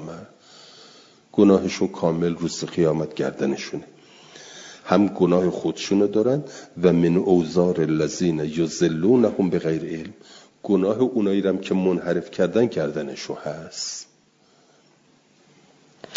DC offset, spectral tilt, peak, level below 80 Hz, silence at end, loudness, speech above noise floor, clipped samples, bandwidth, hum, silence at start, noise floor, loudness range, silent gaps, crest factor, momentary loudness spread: under 0.1%; -6.5 dB/octave; -2 dBFS; -62 dBFS; 0 s; -22 LUFS; 38 dB; under 0.1%; 7.8 kHz; none; 0 s; -59 dBFS; 6 LU; none; 20 dB; 15 LU